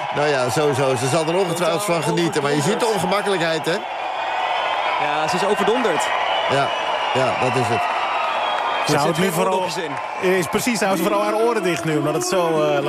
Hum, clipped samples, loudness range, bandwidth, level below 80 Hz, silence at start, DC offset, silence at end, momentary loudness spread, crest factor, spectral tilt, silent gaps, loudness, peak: none; under 0.1%; 1 LU; 15 kHz; -60 dBFS; 0 s; under 0.1%; 0 s; 3 LU; 14 dB; -4 dB/octave; none; -20 LUFS; -6 dBFS